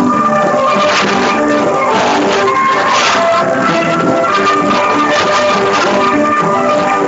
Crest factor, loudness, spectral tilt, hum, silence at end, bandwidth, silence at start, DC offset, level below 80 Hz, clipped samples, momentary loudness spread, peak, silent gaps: 10 dB; -11 LUFS; -4 dB/octave; none; 0 s; 8.2 kHz; 0 s; under 0.1%; -48 dBFS; under 0.1%; 2 LU; 0 dBFS; none